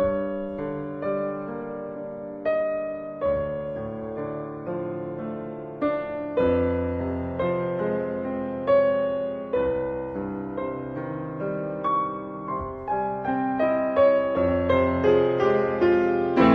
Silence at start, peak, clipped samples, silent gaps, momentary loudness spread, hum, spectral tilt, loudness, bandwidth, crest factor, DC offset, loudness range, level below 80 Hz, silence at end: 0 s; -4 dBFS; under 0.1%; none; 12 LU; none; -9 dB/octave; -26 LUFS; 6.2 kHz; 20 dB; under 0.1%; 7 LU; -50 dBFS; 0 s